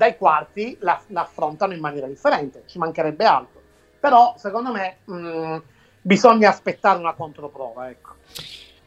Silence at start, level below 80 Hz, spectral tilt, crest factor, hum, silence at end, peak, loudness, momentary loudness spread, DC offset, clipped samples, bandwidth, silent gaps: 0 s; -62 dBFS; -5.5 dB/octave; 20 dB; none; 0.3 s; 0 dBFS; -20 LUFS; 19 LU; under 0.1%; under 0.1%; 14.5 kHz; none